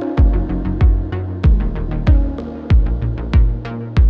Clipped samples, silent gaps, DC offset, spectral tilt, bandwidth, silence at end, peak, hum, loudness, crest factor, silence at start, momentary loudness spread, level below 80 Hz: under 0.1%; none; under 0.1%; -9.5 dB/octave; 4.9 kHz; 0 s; -2 dBFS; none; -18 LUFS; 14 dB; 0 s; 7 LU; -16 dBFS